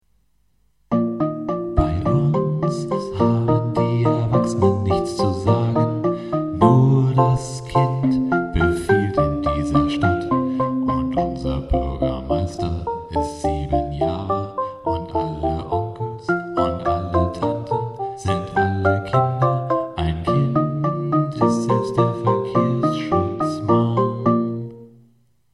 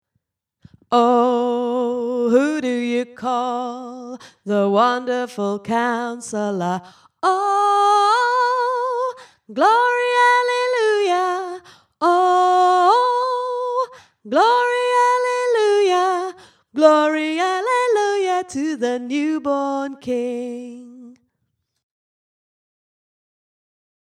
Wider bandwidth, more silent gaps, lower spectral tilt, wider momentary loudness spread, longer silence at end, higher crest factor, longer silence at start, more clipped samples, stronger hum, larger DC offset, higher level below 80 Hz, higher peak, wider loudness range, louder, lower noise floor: about the same, 11.5 kHz vs 11.5 kHz; neither; first, -8 dB/octave vs -4 dB/octave; second, 7 LU vs 12 LU; second, 0.65 s vs 2.95 s; about the same, 18 dB vs 18 dB; about the same, 0.9 s vs 0.9 s; neither; neither; neither; first, -36 dBFS vs -72 dBFS; about the same, -2 dBFS vs 0 dBFS; about the same, 5 LU vs 7 LU; second, -21 LUFS vs -18 LUFS; second, -64 dBFS vs -74 dBFS